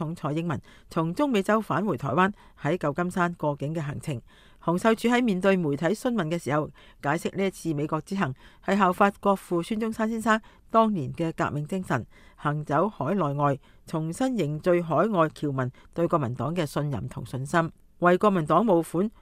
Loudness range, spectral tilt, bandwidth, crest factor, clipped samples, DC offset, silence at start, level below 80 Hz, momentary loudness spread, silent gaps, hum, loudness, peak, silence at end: 2 LU; -6.5 dB/octave; 15.5 kHz; 20 dB; under 0.1%; under 0.1%; 0 s; -56 dBFS; 10 LU; none; none; -26 LUFS; -6 dBFS; 0.15 s